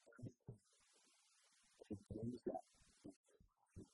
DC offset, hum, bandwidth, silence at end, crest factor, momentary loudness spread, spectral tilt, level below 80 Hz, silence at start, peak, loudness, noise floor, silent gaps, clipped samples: under 0.1%; none; 11.5 kHz; 0.05 s; 22 dB; 17 LU; -7.5 dB/octave; -76 dBFS; 0.05 s; -34 dBFS; -54 LUFS; -77 dBFS; 3.16-3.24 s; under 0.1%